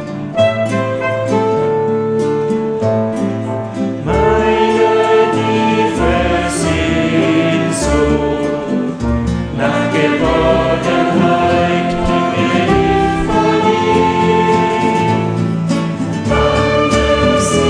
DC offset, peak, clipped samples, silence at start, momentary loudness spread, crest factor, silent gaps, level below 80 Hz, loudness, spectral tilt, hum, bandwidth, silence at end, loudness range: under 0.1%; -2 dBFS; under 0.1%; 0 s; 5 LU; 12 dB; none; -28 dBFS; -14 LUFS; -6 dB/octave; none; 11 kHz; 0 s; 2 LU